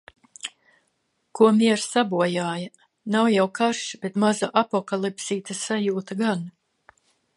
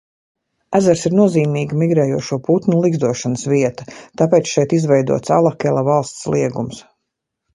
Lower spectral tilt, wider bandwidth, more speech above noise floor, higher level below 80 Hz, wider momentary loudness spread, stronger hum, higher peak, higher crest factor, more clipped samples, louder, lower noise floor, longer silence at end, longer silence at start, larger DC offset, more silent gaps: second, -4.5 dB/octave vs -6.5 dB/octave; about the same, 11.5 kHz vs 11.5 kHz; second, 50 dB vs 61 dB; second, -74 dBFS vs -54 dBFS; first, 17 LU vs 7 LU; neither; second, -4 dBFS vs 0 dBFS; about the same, 20 dB vs 16 dB; neither; second, -23 LUFS vs -16 LUFS; second, -72 dBFS vs -77 dBFS; about the same, 0.85 s vs 0.75 s; second, 0.45 s vs 0.7 s; neither; neither